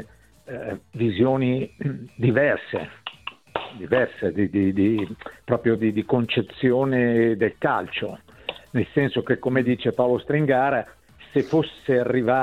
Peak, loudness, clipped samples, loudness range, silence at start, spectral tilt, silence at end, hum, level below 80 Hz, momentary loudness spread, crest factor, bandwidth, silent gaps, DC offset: -6 dBFS; -23 LUFS; under 0.1%; 2 LU; 0 s; -8.5 dB/octave; 0 s; none; -56 dBFS; 14 LU; 18 dB; 9.6 kHz; none; under 0.1%